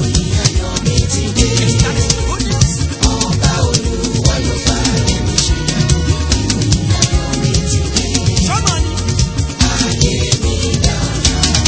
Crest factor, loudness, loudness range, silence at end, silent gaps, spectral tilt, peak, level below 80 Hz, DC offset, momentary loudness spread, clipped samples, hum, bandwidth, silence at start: 14 dB; -14 LUFS; 1 LU; 0 s; none; -4 dB/octave; 0 dBFS; -20 dBFS; under 0.1%; 3 LU; under 0.1%; none; 8 kHz; 0 s